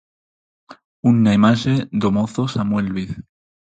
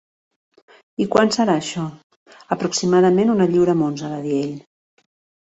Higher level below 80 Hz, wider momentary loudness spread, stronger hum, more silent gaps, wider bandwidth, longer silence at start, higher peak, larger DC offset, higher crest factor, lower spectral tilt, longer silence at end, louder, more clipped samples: first, -48 dBFS vs -60 dBFS; about the same, 12 LU vs 13 LU; neither; about the same, 0.85-1.03 s vs 2.03-2.10 s, 2.16-2.26 s; about the same, 8.8 kHz vs 8.2 kHz; second, 0.7 s vs 1 s; about the same, -2 dBFS vs -2 dBFS; neither; about the same, 16 dB vs 18 dB; first, -7 dB/octave vs -5.5 dB/octave; second, 0.55 s vs 0.95 s; about the same, -18 LUFS vs -19 LUFS; neither